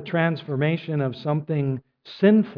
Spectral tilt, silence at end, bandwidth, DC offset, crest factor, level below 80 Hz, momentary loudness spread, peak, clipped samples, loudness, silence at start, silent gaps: -10 dB/octave; 0 s; 5.4 kHz; under 0.1%; 16 dB; -66 dBFS; 9 LU; -6 dBFS; under 0.1%; -24 LUFS; 0 s; none